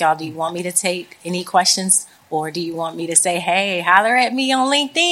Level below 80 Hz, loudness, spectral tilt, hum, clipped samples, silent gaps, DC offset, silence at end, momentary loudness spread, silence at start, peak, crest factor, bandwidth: -72 dBFS; -17 LUFS; -2 dB/octave; none; under 0.1%; none; under 0.1%; 0 s; 11 LU; 0 s; 0 dBFS; 18 dB; 16.5 kHz